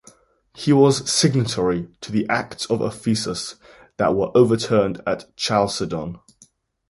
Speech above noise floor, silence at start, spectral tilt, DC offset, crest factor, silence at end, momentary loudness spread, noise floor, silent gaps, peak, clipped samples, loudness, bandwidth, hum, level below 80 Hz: 36 dB; 0.55 s; -5 dB/octave; under 0.1%; 18 dB; 0.7 s; 11 LU; -56 dBFS; none; -2 dBFS; under 0.1%; -20 LUFS; 11.5 kHz; none; -52 dBFS